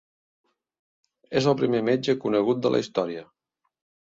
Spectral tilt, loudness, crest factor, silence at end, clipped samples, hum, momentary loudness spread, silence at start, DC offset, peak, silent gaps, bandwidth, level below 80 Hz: -6.5 dB/octave; -24 LUFS; 18 dB; 0.8 s; under 0.1%; none; 7 LU; 1.3 s; under 0.1%; -8 dBFS; none; 7.8 kHz; -66 dBFS